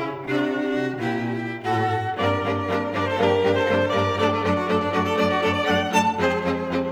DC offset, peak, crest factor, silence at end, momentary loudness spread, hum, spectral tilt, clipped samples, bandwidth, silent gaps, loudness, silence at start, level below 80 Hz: under 0.1%; -6 dBFS; 16 dB; 0 s; 5 LU; none; -5.5 dB/octave; under 0.1%; over 20 kHz; none; -22 LUFS; 0 s; -56 dBFS